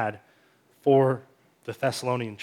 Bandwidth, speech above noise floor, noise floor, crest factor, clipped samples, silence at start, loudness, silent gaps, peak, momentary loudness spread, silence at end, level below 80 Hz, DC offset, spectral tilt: 16 kHz; 37 dB; -62 dBFS; 18 dB; under 0.1%; 0 s; -26 LUFS; none; -8 dBFS; 16 LU; 0 s; -78 dBFS; under 0.1%; -6 dB/octave